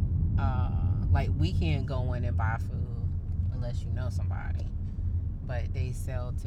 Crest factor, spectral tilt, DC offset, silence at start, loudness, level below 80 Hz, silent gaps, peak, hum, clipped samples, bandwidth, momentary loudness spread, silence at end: 14 dB; -8 dB/octave; under 0.1%; 0 s; -31 LUFS; -34 dBFS; none; -14 dBFS; none; under 0.1%; 11 kHz; 7 LU; 0 s